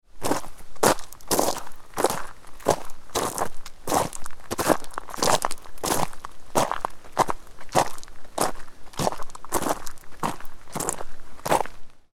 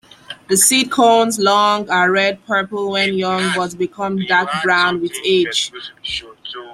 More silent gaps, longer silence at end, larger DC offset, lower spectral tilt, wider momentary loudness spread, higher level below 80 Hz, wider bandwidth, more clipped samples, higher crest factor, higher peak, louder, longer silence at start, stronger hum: neither; first, 0.15 s vs 0 s; neither; about the same, -3 dB/octave vs -2.5 dB/octave; first, 15 LU vs 12 LU; first, -42 dBFS vs -58 dBFS; first, 18 kHz vs 15.5 kHz; neither; first, 24 dB vs 16 dB; about the same, 0 dBFS vs 0 dBFS; second, -27 LUFS vs -16 LUFS; second, 0.15 s vs 0.3 s; neither